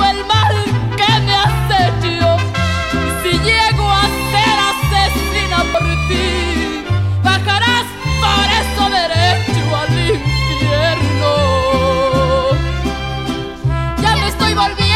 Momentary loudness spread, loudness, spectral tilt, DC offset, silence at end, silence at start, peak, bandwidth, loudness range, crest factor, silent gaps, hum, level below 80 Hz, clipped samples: 5 LU; -14 LUFS; -5 dB/octave; 0.4%; 0 s; 0 s; -2 dBFS; 16 kHz; 2 LU; 12 dB; none; none; -24 dBFS; under 0.1%